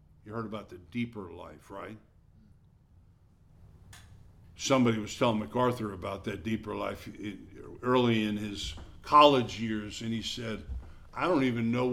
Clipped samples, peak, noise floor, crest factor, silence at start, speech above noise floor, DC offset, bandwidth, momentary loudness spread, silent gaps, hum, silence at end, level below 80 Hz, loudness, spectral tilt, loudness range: under 0.1%; -6 dBFS; -60 dBFS; 26 dB; 0.25 s; 30 dB; under 0.1%; 15 kHz; 19 LU; none; none; 0 s; -52 dBFS; -30 LUFS; -5.5 dB/octave; 16 LU